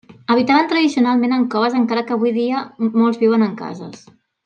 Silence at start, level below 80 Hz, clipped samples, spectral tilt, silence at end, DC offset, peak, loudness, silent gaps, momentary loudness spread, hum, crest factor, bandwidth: 0.1 s; -70 dBFS; under 0.1%; -6 dB/octave; 0.5 s; under 0.1%; -2 dBFS; -17 LUFS; none; 9 LU; none; 14 dB; 8.6 kHz